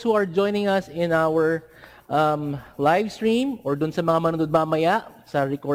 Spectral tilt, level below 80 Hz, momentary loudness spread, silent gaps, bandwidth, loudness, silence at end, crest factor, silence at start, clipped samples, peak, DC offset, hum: -6.5 dB/octave; -58 dBFS; 5 LU; none; 16 kHz; -23 LUFS; 0 s; 14 dB; 0 s; under 0.1%; -8 dBFS; under 0.1%; none